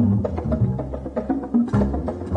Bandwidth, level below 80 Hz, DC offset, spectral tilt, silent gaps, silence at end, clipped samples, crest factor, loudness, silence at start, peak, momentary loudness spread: 8.8 kHz; -34 dBFS; under 0.1%; -10.5 dB/octave; none; 0 s; under 0.1%; 14 dB; -23 LUFS; 0 s; -8 dBFS; 8 LU